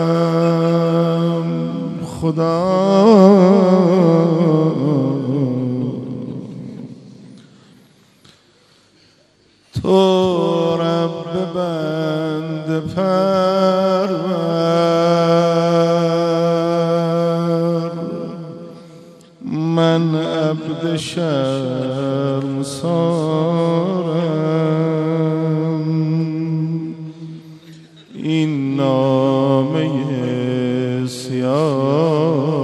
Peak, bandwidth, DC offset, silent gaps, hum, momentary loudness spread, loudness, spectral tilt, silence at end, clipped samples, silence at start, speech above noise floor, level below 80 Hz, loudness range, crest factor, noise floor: 0 dBFS; 12 kHz; under 0.1%; none; none; 12 LU; -17 LUFS; -7.5 dB/octave; 0 s; under 0.1%; 0 s; 42 dB; -56 dBFS; 8 LU; 16 dB; -54 dBFS